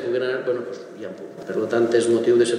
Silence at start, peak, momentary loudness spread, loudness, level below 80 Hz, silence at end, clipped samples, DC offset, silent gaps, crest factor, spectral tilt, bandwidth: 0 s; -6 dBFS; 17 LU; -21 LUFS; -78 dBFS; 0 s; under 0.1%; under 0.1%; none; 16 dB; -5 dB/octave; 11 kHz